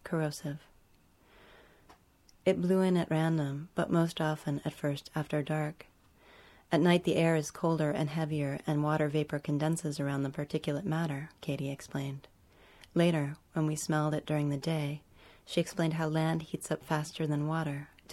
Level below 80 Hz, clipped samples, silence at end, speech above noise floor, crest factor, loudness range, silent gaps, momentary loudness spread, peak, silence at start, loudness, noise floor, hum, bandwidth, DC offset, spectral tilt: -64 dBFS; under 0.1%; 0 s; 33 dB; 22 dB; 4 LU; none; 10 LU; -10 dBFS; 0.05 s; -32 LUFS; -64 dBFS; none; 13.5 kHz; under 0.1%; -6.5 dB/octave